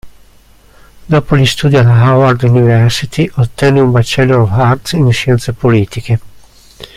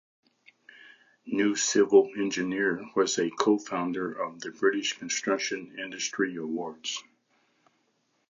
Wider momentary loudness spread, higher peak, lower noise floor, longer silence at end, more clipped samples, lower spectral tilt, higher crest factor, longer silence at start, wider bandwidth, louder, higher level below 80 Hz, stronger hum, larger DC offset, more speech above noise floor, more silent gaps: second, 6 LU vs 12 LU; first, 0 dBFS vs -8 dBFS; second, -42 dBFS vs -73 dBFS; second, 0.1 s vs 1.3 s; neither; first, -6.5 dB/octave vs -3 dB/octave; second, 10 dB vs 22 dB; second, 0.05 s vs 0.85 s; first, 13.5 kHz vs 7.6 kHz; first, -10 LUFS vs -28 LUFS; first, -36 dBFS vs -76 dBFS; neither; neither; second, 33 dB vs 45 dB; neither